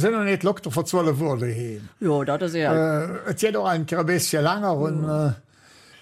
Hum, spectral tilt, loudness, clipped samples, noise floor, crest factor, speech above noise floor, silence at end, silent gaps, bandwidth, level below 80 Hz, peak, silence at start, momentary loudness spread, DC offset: none; -5.5 dB/octave; -23 LUFS; under 0.1%; -52 dBFS; 14 dB; 30 dB; 0.6 s; none; 15.5 kHz; -62 dBFS; -10 dBFS; 0 s; 6 LU; under 0.1%